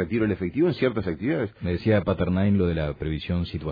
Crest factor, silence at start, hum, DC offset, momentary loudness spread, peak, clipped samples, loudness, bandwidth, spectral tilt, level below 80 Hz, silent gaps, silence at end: 16 dB; 0 s; none; under 0.1%; 6 LU; -10 dBFS; under 0.1%; -25 LUFS; 5 kHz; -10 dB/octave; -42 dBFS; none; 0 s